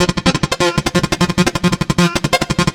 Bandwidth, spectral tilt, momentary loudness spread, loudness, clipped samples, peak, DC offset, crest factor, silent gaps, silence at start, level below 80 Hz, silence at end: 17 kHz; -4.5 dB/octave; 2 LU; -15 LUFS; under 0.1%; 0 dBFS; 0.2%; 16 dB; none; 0 s; -32 dBFS; 0 s